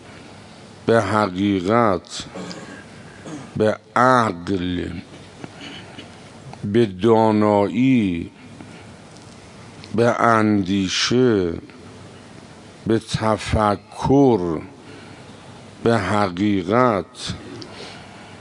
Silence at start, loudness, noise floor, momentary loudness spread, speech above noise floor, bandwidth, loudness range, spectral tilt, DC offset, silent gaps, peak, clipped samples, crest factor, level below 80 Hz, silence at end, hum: 0.05 s; -19 LUFS; -42 dBFS; 25 LU; 23 dB; 11 kHz; 2 LU; -6 dB/octave; under 0.1%; none; 0 dBFS; under 0.1%; 20 dB; -48 dBFS; 0 s; none